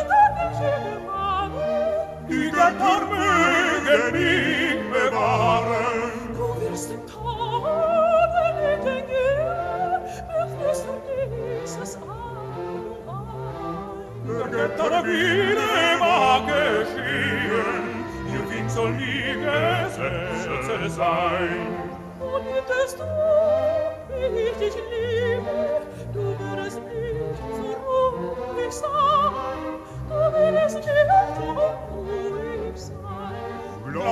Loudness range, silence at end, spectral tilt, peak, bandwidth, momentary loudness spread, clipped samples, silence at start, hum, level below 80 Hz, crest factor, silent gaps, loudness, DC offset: 7 LU; 0 s; -5 dB/octave; -4 dBFS; 14 kHz; 13 LU; under 0.1%; 0 s; none; -46 dBFS; 18 dB; none; -23 LUFS; under 0.1%